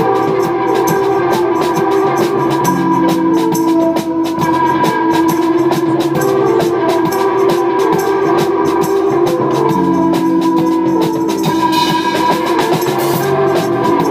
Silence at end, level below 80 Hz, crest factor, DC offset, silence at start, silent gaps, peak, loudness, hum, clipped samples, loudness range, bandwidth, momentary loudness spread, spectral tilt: 0 s; -52 dBFS; 12 dB; under 0.1%; 0 s; none; 0 dBFS; -13 LUFS; none; under 0.1%; 0 LU; 16 kHz; 2 LU; -5.5 dB/octave